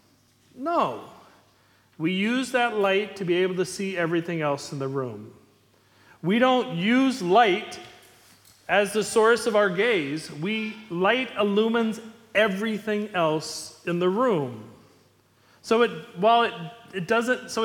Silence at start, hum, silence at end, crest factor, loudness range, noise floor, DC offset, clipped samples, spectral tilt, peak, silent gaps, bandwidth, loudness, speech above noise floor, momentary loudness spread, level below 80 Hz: 0.55 s; none; 0 s; 20 dB; 4 LU; -61 dBFS; under 0.1%; under 0.1%; -5 dB/octave; -6 dBFS; none; 17.5 kHz; -24 LUFS; 37 dB; 13 LU; -70 dBFS